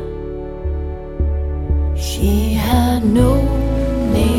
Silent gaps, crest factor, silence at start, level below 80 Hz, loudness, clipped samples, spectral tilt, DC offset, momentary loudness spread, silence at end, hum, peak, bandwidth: none; 14 dB; 0 s; -20 dBFS; -18 LUFS; under 0.1%; -7 dB/octave; under 0.1%; 12 LU; 0 s; none; -2 dBFS; 16.5 kHz